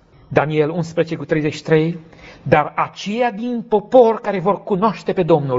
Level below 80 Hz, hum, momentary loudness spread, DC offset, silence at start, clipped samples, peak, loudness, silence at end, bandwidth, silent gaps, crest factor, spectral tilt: -52 dBFS; none; 9 LU; under 0.1%; 0.3 s; under 0.1%; 0 dBFS; -18 LUFS; 0 s; 7.8 kHz; none; 18 dB; -6 dB/octave